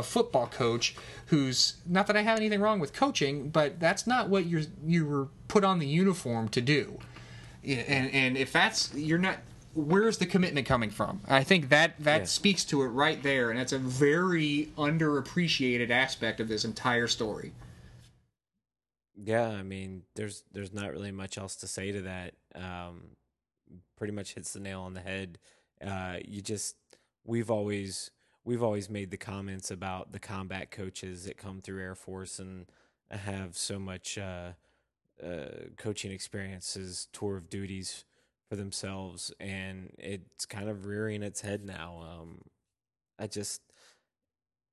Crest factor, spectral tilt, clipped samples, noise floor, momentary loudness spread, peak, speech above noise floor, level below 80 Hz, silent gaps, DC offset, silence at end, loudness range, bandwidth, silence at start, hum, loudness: 26 dB; -4.5 dB/octave; under 0.1%; under -90 dBFS; 17 LU; -6 dBFS; over 59 dB; -58 dBFS; none; under 0.1%; 1.15 s; 14 LU; 12.5 kHz; 0 s; none; -30 LUFS